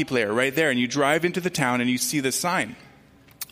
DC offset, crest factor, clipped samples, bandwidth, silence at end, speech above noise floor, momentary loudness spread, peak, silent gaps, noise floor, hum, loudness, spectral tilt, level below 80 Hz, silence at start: under 0.1%; 18 dB; under 0.1%; 16 kHz; 0.05 s; 30 dB; 4 LU; -6 dBFS; none; -53 dBFS; none; -23 LUFS; -3.5 dB/octave; -62 dBFS; 0 s